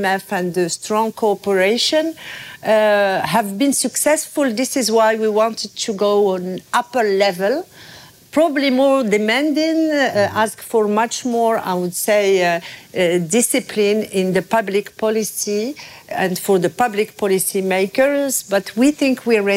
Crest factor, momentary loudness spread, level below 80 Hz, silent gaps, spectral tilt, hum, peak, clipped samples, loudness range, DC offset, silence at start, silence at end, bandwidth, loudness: 12 dB; 6 LU; -62 dBFS; none; -3.5 dB/octave; none; -4 dBFS; under 0.1%; 2 LU; under 0.1%; 0 s; 0 s; 16 kHz; -17 LUFS